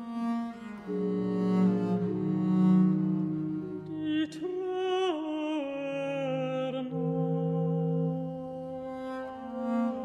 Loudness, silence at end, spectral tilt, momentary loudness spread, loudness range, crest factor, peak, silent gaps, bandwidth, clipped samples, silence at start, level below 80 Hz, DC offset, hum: -31 LUFS; 0 s; -8.5 dB/octave; 12 LU; 4 LU; 14 dB; -16 dBFS; none; 7.6 kHz; under 0.1%; 0 s; -68 dBFS; under 0.1%; none